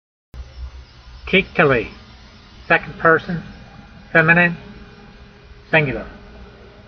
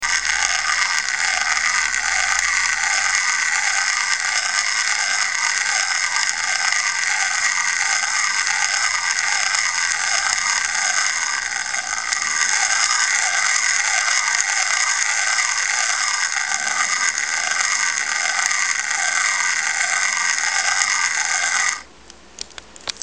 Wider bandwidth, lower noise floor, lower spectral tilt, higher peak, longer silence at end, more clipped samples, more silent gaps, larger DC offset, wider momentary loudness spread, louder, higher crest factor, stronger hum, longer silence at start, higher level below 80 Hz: second, 6.4 kHz vs 10.5 kHz; about the same, -43 dBFS vs -45 dBFS; first, -4 dB/octave vs 3.5 dB/octave; about the same, 0 dBFS vs 0 dBFS; first, 0.45 s vs 0 s; neither; neither; second, under 0.1% vs 0.4%; first, 24 LU vs 3 LU; about the same, -16 LUFS vs -17 LUFS; about the same, 20 dB vs 20 dB; neither; first, 0.35 s vs 0 s; first, -42 dBFS vs -56 dBFS